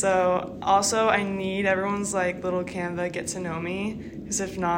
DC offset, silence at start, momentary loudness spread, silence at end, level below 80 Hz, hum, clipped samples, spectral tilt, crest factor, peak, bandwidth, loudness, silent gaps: under 0.1%; 0 s; 9 LU; 0 s; -54 dBFS; none; under 0.1%; -4 dB/octave; 20 dB; -6 dBFS; 16 kHz; -26 LUFS; none